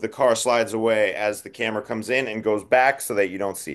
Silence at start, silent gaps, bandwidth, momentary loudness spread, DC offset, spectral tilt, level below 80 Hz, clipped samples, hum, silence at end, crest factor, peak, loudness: 0 s; none; 12.5 kHz; 8 LU; under 0.1%; -3.5 dB/octave; -66 dBFS; under 0.1%; none; 0 s; 16 dB; -6 dBFS; -22 LUFS